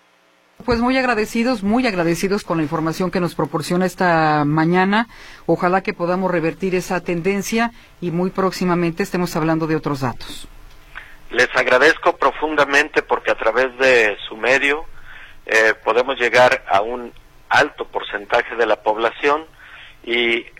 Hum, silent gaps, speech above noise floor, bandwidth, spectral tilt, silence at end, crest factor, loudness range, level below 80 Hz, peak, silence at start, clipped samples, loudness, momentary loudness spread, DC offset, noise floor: none; none; 38 dB; 16.5 kHz; -5 dB/octave; 0.15 s; 16 dB; 5 LU; -44 dBFS; -2 dBFS; 0.65 s; under 0.1%; -18 LUFS; 11 LU; under 0.1%; -56 dBFS